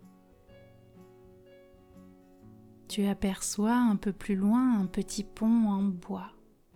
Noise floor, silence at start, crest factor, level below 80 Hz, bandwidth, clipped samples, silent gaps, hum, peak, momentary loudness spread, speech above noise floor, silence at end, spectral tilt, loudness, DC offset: -57 dBFS; 0.05 s; 14 dB; -54 dBFS; 16.5 kHz; under 0.1%; none; none; -16 dBFS; 12 LU; 29 dB; 0.45 s; -5.5 dB/octave; -29 LUFS; under 0.1%